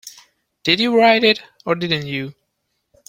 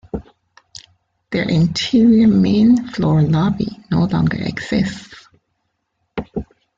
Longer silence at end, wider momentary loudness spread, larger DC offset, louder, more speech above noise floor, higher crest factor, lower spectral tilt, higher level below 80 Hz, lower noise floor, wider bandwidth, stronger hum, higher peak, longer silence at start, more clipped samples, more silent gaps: first, 0.8 s vs 0.35 s; second, 14 LU vs 18 LU; neither; about the same, -17 LUFS vs -16 LUFS; about the same, 55 dB vs 56 dB; about the same, 18 dB vs 14 dB; second, -5 dB/octave vs -7 dB/octave; second, -60 dBFS vs -44 dBFS; about the same, -72 dBFS vs -71 dBFS; first, 16.5 kHz vs 7.8 kHz; neither; first, 0 dBFS vs -4 dBFS; about the same, 0.05 s vs 0.15 s; neither; neither